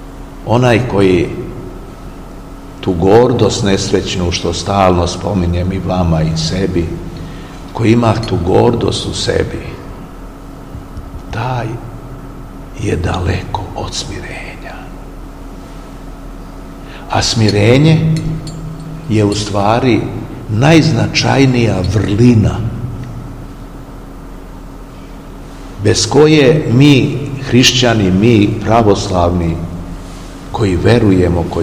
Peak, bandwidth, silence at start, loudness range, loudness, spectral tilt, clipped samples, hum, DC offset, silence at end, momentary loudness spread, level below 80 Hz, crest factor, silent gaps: 0 dBFS; 15.5 kHz; 0 s; 12 LU; -12 LUFS; -5.5 dB/octave; 0.4%; none; 0.3%; 0 s; 23 LU; -30 dBFS; 14 dB; none